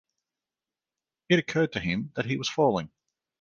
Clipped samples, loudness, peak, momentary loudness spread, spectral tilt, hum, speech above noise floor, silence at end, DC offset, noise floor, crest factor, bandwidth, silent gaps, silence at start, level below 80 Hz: under 0.1%; -27 LUFS; -8 dBFS; 7 LU; -5.5 dB/octave; none; over 64 dB; 0.55 s; under 0.1%; under -90 dBFS; 22 dB; 7.4 kHz; none; 1.3 s; -60 dBFS